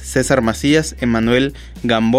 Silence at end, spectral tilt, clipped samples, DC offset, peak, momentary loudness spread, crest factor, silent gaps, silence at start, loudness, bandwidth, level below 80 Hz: 0 s; -5 dB/octave; under 0.1%; under 0.1%; -2 dBFS; 5 LU; 14 dB; none; 0 s; -16 LUFS; 15.5 kHz; -34 dBFS